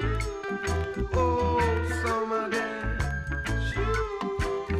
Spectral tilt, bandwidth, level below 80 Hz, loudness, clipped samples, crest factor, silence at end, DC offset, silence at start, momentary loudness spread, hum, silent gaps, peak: -6 dB/octave; 14.5 kHz; -34 dBFS; -28 LUFS; under 0.1%; 16 dB; 0 s; under 0.1%; 0 s; 6 LU; none; none; -12 dBFS